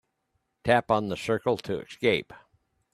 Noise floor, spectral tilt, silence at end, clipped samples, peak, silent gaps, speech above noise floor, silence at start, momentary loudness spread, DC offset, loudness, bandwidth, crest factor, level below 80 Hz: -77 dBFS; -5.5 dB/octave; 0.6 s; under 0.1%; -6 dBFS; none; 50 dB; 0.65 s; 8 LU; under 0.1%; -27 LUFS; 13.5 kHz; 22 dB; -60 dBFS